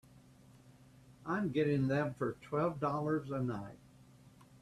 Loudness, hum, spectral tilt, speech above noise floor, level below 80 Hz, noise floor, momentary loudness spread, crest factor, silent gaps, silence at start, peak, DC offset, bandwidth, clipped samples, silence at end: -36 LUFS; none; -8.5 dB/octave; 26 dB; -68 dBFS; -61 dBFS; 9 LU; 16 dB; none; 0.15 s; -22 dBFS; under 0.1%; 12.5 kHz; under 0.1%; 0.15 s